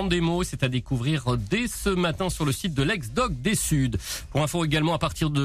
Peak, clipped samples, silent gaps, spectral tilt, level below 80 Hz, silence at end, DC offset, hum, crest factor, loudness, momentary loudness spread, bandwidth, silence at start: -10 dBFS; under 0.1%; none; -5 dB/octave; -38 dBFS; 0 s; under 0.1%; none; 14 dB; -25 LUFS; 3 LU; 15.5 kHz; 0 s